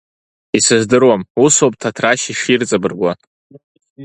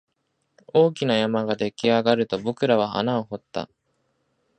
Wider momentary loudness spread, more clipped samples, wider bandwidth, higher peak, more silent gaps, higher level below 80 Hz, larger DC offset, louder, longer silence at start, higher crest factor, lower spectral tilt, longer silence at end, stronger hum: second, 9 LU vs 12 LU; neither; first, 11.5 kHz vs 9.2 kHz; first, 0 dBFS vs -4 dBFS; first, 1.30-1.35 s, 3.27-3.50 s, 3.64-3.75 s, 3.90-3.96 s vs none; first, -54 dBFS vs -64 dBFS; neither; first, -14 LUFS vs -23 LUFS; second, 0.55 s vs 0.75 s; about the same, 16 dB vs 20 dB; second, -3.5 dB/octave vs -6 dB/octave; second, 0 s vs 0.95 s; neither